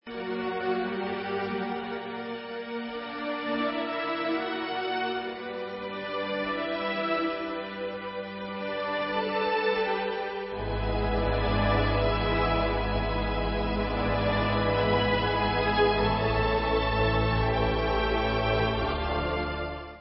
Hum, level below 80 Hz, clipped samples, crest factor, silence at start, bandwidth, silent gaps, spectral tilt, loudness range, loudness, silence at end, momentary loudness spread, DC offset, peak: none; -38 dBFS; under 0.1%; 16 dB; 0.05 s; 5.8 kHz; none; -10 dB/octave; 6 LU; -28 LUFS; 0 s; 10 LU; under 0.1%; -12 dBFS